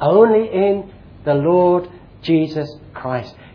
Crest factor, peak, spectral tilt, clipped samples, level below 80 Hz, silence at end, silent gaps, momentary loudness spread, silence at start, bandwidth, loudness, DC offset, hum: 16 dB; 0 dBFS; -9.5 dB/octave; under 0.1%; -50 dBFS; 0.25 s; none; 17 LU; 0 s; 5.4 kHz; -17 LUFS; under 0.1%; none